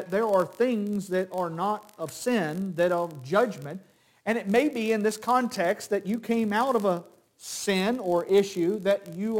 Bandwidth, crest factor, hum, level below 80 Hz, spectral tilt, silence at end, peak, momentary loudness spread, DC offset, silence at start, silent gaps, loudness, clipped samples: 17 kHz; 16 dB; none; -72 dBFS; -5 dB/octave; 0 s; -10 dBFS; 9 LU; under 0.1%; 0 s; none; -27 LUFS; under 0.1%